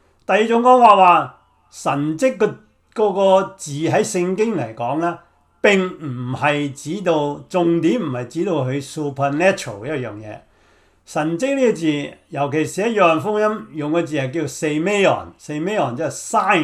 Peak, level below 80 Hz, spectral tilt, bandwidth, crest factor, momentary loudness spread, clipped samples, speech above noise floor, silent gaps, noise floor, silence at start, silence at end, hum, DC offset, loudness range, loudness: 0 dBFS; -60 dBFS; -5.5 dB/octave; 13.5 kHz; 18 dB; 12 LU; under 0.1%; 37 dB; none; -55 dBFS; 0.3 s; 0 s; none; under 0.1%; 6 LU; -18 LUFS